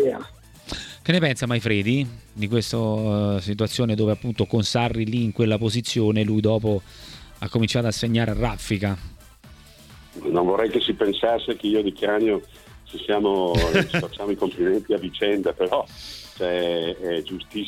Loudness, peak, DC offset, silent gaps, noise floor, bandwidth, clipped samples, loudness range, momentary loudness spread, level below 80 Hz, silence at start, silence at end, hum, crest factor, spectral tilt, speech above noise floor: -23 LUFS; -4 dBFS; under 0.1%; none; -47 dBFS; 15.5 kHz; under 0.1%; 2 LU; 12 LU; -42 dBFS; 0 s; 0 s; none; 18 dB; -6 dB/octave; 25 dB